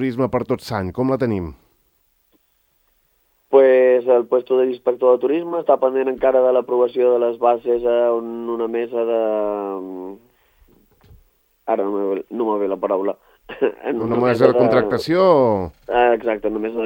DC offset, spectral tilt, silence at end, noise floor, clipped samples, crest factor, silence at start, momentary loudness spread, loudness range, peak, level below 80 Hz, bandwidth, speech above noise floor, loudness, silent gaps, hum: under 0.1%; -7.5 dB/octave; 0 s; -63 dBFS; under 0.1%; 18 dB; 0 s; 10 LU; 8 LU; 0 dBFS; -54 dBFS; 16.5 kHz; 46 dB; -18 LUFS; none; none